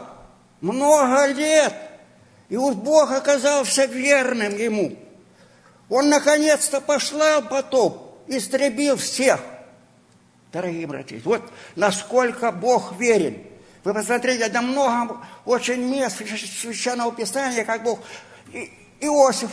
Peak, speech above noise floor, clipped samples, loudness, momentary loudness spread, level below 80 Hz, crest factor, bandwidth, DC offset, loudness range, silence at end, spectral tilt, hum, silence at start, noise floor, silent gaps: -2 dBFS; 35 dB; under 0.1%; -20 LUFS; 13 LU; -66 dBFS; 20 dB; 11 kHz; under 0.1%; 5 LU; 0 s; -3 dB/octave; none; 0 s; -55 dBFS; none